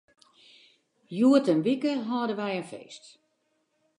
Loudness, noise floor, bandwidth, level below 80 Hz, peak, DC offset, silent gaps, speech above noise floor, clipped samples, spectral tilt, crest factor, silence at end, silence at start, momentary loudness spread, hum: -26 LUFS; -74 dBFS; 10.5 kHz; -84 dBFS; -10 dBFS; under 0.1%; none; 48 dB; under 0.1%; -6.5 dB/octave; 18 dB; 1 s; 1.1 s; 22 LU; none